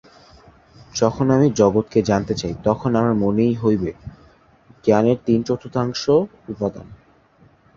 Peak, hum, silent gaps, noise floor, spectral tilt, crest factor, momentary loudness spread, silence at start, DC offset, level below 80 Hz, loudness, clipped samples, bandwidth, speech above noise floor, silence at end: -2 dBFS; none; none; -54 dBFS; -6.5 dB/octave; 18 dB; 11 LU; 0.95 s; under 0.1%; -46 dBFS; -19 LUFS; under 0.1%; 7.4 kHz; 35 dB; 0.8 s